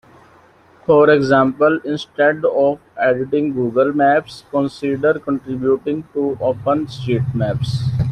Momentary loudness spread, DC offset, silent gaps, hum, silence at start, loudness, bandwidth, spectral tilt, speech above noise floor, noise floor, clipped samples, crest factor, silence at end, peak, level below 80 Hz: 8 LU; under 0.1%; none; none; 0.9 s; -17 LUFS; 11 kHz; -7.5 dB/octave; 32 dB; -49 dBFS; under 0.1%; 16 dB; 0 s; -2 dBFS; -48 dBFS